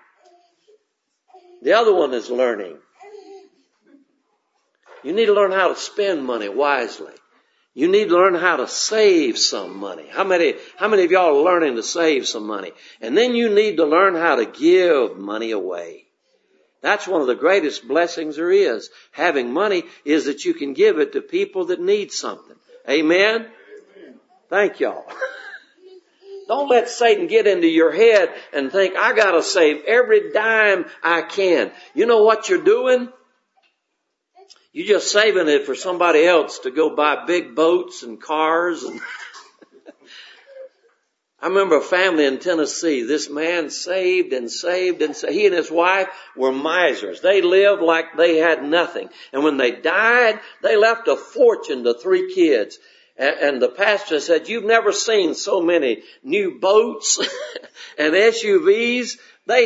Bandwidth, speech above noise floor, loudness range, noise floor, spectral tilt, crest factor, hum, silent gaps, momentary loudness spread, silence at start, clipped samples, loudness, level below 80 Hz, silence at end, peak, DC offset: 8 kHz; 57 dB; 6 LU; -75 dBFS; -2.5 dB/octave; 18 dB; none; none; 12 LU; 1.6 s; under 0.1%; -18 LUFS; -78 dBFS; 0 s; 0 dBFS; under 0.1%